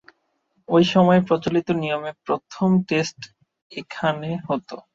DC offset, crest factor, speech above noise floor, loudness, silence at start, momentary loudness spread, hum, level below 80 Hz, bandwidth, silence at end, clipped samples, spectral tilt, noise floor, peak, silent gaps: under 0.1%; 18 dB; 48 dB; -21 LUFS; 0.7 s; 18 LU; none; -60 dBFS; 7.6 kHz; 0.15 s; under 0.1%; -6.5 dB/octave; -69 dBFS; -4 dBFS; 3.62-3.70 s